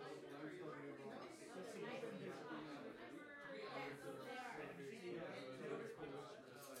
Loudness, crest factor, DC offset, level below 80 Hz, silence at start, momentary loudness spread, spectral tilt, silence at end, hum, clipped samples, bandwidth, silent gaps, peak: -53 LUFS; 16 dB; under 0.1%; -88 dBFS; 0 s; 5 LU; -5 dB/octave; 0 s; none; under 0.1%; 16 kHz; none; -38 dBFS